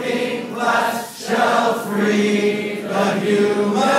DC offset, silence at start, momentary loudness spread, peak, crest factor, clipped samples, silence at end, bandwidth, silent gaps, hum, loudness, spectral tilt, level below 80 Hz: under 0.1%; 0 s; 6 LU; -4 dBFS; 16 dB; under 0.1%; 0 s; 16 kHz; none; none; -19 LUFS; -4.5 dB/octave; -68 dBFS